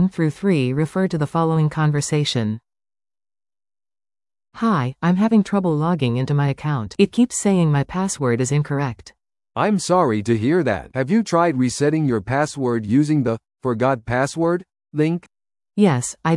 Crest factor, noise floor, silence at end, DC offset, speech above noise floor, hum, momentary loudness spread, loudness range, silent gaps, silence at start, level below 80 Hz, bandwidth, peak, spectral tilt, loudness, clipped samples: 16 dB; under -90 dBFS; 0 s; under 0.1%; over 71 dB; none; 7 LU; 4 LU; none; 0 s; -52 dBFS; 12 kHz; -2 dBFS; -6 dB/octave; -20 LUFS; under 0.1%